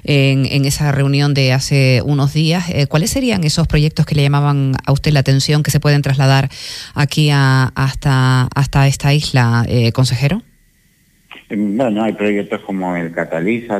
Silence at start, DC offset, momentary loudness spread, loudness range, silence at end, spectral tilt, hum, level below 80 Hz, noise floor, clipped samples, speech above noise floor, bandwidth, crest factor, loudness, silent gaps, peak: 0.05 s; under 0.1%; 7 LU; 4 LU; 0 s; -5.5 dB/octave; none; -36 dBFS; -54 dBFS; under 0.1%; 40 dB; 14.5 kHz; 12 dB; -14 LUFS; none; -2 dBFS